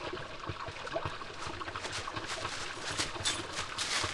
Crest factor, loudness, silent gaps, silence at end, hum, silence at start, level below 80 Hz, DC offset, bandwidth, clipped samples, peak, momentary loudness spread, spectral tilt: 20 dB; -37 LUFS; none; 0 s; none; 0 s; -56 dBFS; under 0.1%; 12.5 kHz; under 0.1%; -18 dBFS; 8 LU; -2 dB/octave